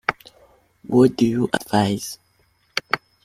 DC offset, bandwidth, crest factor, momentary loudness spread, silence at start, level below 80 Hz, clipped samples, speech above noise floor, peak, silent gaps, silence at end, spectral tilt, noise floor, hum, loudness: under 0.1%; 15.5 kHz; 20 dB; 12 LU; 0.1 s; -56 dBFS; under 0.1%; 44 dB; -2 dBFS; none; 0.3 s; -5.5 dB/octave; -62 dBFS; none; -21 LUFS